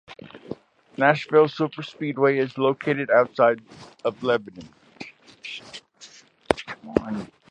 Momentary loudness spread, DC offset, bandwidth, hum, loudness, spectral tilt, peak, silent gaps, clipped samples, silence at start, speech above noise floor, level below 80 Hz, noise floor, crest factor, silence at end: 22 LU; under 0.1%; 10.5 kHz; none; -23 LUFS; -6 dB/octave; 0 dBFS; none; under 0.1%; 0.1 s; 27 dB; -56 dBFS; -50 dBFS; 24 dB; 0.25 s